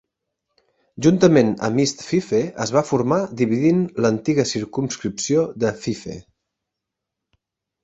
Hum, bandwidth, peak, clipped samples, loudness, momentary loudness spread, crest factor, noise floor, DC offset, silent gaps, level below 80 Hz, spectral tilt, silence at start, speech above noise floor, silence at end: none; 8 kHz; -2 dBFS; under 0.1%; -20 LUFS; 10 LU; 20 dB; -83 dBFS; under 0.1%; none; -56 dBFS; -5.5 dB/octave; 0.95 s; 64 dB; 1.65 s